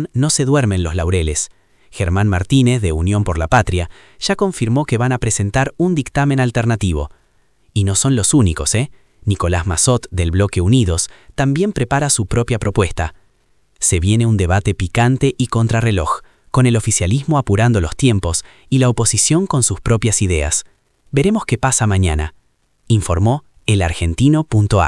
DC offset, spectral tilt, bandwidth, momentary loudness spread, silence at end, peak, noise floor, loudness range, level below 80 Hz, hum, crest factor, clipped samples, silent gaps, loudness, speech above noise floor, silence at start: under 0.1%; -5 dB/octave; 12 kHz; 7 LU; 0 s; 0 dBFS; -58 dBFS; 2 LU; -32 dBFS; none; 16 dB; under 0.1%; none; -16 LUFS; 43 dB; 0 s